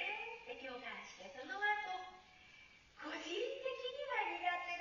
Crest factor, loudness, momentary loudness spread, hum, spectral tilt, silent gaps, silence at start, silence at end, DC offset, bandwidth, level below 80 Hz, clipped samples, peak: 18 dB; -43 LUFS; 21 LU; none; 1 dB/octave; none; 0 s; 0 s; under 0.1%; 7.2 kHz; -78 dBFS; under 0.1%; -26 dBFS